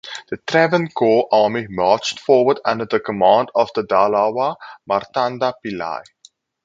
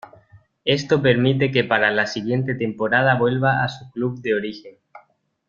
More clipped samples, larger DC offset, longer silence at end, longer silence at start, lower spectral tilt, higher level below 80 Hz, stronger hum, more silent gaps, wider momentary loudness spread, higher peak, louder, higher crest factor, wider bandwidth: neither; neither; first, 0.65 s vs 0.5 s; second, 0.05 s vs 0.65 s; second, -5 dB/octave vs -6.5 dB/octave; about the same, -58 dBFS vs -58 dBFS; neither; neither; first, 12 LU vs 9 LU; about the same, 0 dBFS vs -2 dBFS; about the same, -18 LUFS vs -20 LUFS; about the same, 18 dB vs 20 dB; about the same, 7.8 kHz vs 7.4 kHz